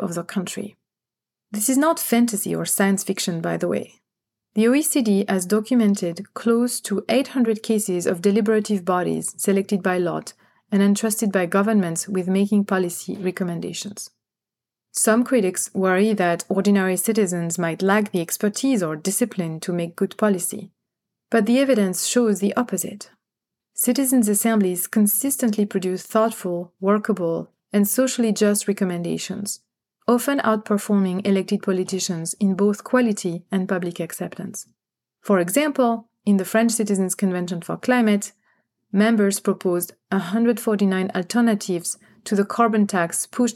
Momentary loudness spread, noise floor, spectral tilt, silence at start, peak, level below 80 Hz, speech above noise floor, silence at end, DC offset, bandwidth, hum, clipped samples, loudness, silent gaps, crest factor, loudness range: 9 LU; -89 dBFS; -5 dB/octave; 0 s; -4 dBFS; -78 dBFS; 68 dB; 0 s; under 0.1%; 17 kHz; none; under 0.1%; -21 LUFS; none; 16 dB; 3 LU